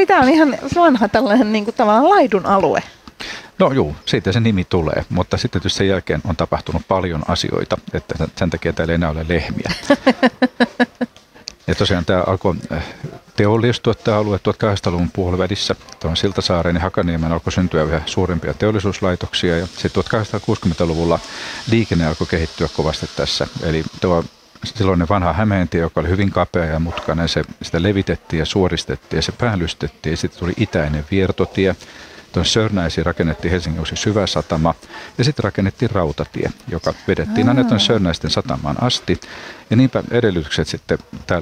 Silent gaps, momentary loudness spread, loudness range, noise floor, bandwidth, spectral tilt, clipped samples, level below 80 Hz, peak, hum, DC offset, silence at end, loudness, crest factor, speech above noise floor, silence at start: none; 9 LU; 4 LU; -38 dBFS; 13 kHz; -6 dB/octave; under 0.1%; -36 dBFS; -2 dBFS; none; under 0.1%; 0 s; -18 LUFS; 16 dB; 21 dB; 0 s